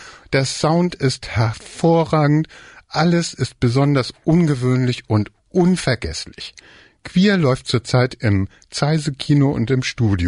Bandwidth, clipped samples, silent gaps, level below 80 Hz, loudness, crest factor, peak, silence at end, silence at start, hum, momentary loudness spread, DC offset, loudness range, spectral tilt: 11 kHz; under 0.1%; none; -42 dBFS; -18 LUFS; 12 dB; -6 dBFS; 0 s; 0 s; none; 7 LU; under 0.1%; 2 LU; -6 dB/octave